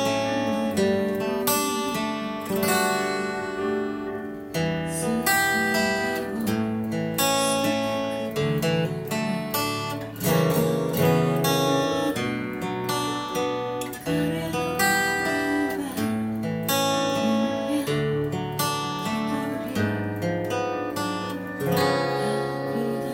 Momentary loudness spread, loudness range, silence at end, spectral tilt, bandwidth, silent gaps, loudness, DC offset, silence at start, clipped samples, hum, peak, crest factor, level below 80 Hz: 7 LU; 3 LU; 0 s; -4.5 dB/octave; 17 kHz; none; -25 LUFS; under 0.1%; 0 s; under 0.1%; none; -8 dBFS; 16 dB; -56 dBFS